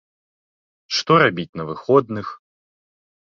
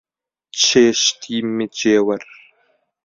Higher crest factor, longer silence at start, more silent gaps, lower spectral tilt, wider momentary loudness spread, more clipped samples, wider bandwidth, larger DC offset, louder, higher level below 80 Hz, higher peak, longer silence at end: about the same, 20 dB vs 18 dB; first, 0.9 s vs 0.55 s; first, 1.49-1.53 s vs none; first, -5 dB/octave vs -2.5 dB/octave; first, 14 LU vs 11 LU; neither; about the same, 7.4 kHz vs 7.8 kHz; neither; second, -19 LUFS vs -16 LUFS; about the same, -60 dBFS vs -60 dBFS; about the same, -2 dBFS vs -2 dBFS; about the same, 0.9 s vs 0.8 s